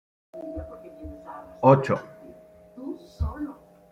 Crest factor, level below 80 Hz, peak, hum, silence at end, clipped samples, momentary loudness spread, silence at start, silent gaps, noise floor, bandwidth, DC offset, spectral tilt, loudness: 26 dB; -44 dBFS; -2 dBFS; none; 0.35 s; under 0.1%; 23 LU; 0.35 s; none; -49 dBFS; 8.4 kHz; under 0.1%; -9 dB/octave; -25 LUFS